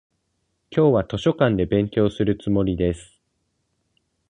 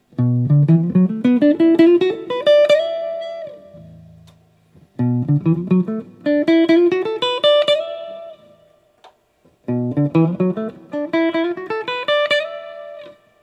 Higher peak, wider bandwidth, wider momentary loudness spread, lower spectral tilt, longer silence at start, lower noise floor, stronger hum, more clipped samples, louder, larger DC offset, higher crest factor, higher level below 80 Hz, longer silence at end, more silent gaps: about the same, -4 dBFS vs -2 dBFS; about the same, 10 kHz vs 10 kHz; second, 6 LU vs 17 LU; about the same, -8 dB/octave vs -8 dB/octave; first, 0.7 s vs 0.2 s; first, -72 dBFS vs -57 dBFS; neither; neither; second, -21 LUFS vs -17 LUFS; neither; about the same, 18 dB vs 16 dB; first, -42 dBFS vs -64 dBFS; first, 1.3 s vs 0.3 s; neither